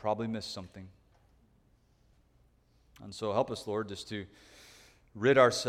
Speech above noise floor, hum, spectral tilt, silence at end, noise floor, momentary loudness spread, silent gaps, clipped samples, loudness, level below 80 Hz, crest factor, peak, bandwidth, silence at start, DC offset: 36 dB; none; -4.5 dB/octave; 0 s; -67 dBFS; 28 LU; none; under 0.1%; -32 LUFS; -66 dBFS; 24 dB; -10 dBFS; 15 kHz; 0.05 s; under 0.1%